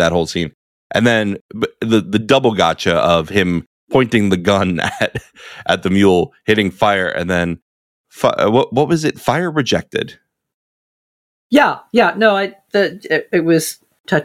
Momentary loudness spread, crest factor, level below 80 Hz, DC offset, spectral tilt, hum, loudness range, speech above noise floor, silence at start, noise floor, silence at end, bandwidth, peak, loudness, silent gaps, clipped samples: 10 LU; 16 dB; -48 dBFS; under 0.1%; -5.5 dB/octave; none; 3 LU; over 75 dB; 0 s; under -90 dBFS; 0 s; 16.5 kHz; -2 dBFS; -16 LUFS; 0.54-0.90 s, 1.41-1.49 s, 3.66-3.87 s, 7.62-8.04 s, 10.54-11.50 s, 14.00-14.04 s; under 0.1%